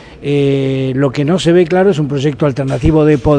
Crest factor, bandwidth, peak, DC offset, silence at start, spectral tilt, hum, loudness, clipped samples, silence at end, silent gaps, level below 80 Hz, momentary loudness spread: 12 dB; 10 kHz; 0 dBFS; under 0.1%; 0 s; -7.5 dB/octave; none; -13 LUFS; under 0.1%; 0 s; none; -32 dBFS; 5 LU